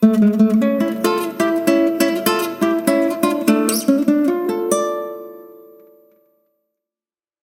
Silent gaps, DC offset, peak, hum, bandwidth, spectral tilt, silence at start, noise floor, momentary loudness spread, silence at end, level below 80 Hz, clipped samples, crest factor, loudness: none; under 0.1%; 0 dBFS; none; 17 kHz; -5 dB/octave; 0 s; under -90 dBFS; 6 LU; 1.85 s; -64 dBFS; under 0.1%; 18 dB; -17 LUFS